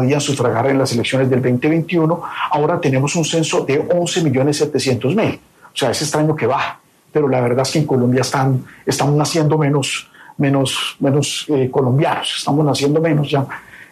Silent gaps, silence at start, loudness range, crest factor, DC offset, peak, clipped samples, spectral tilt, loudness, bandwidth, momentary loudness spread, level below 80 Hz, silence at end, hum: none; 0 s; 1 LU; 14 dB; under 0.1%; -4 dBFS; under 0.1%; -5.5 dB/octave; -17 LUFS; 14 kHz; 5 LU; -56 dBFS; 0.05 s; none